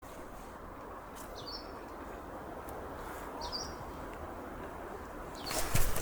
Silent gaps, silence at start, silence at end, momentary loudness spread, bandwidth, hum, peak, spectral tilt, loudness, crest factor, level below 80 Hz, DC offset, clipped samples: none; 0 s; 0 s; 11 LU; over 20 kHz; none; -14 dBFS; -3.5 dB/octave; -42 LUFS; 24 dB; -44 dBFS; under 0.1%; under 0.1%